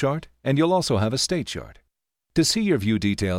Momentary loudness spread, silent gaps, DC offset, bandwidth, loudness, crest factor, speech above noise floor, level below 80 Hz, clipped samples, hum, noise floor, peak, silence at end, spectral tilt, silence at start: 8 LU; none; under 0.1%; 16.5 kHz; -23 LUFS; 14 dB; 54 dB; -48 dBFS; under 0.1%; none; -76 dBFS; -8 dBFS; 0 s; -5 dB/octave; 0 s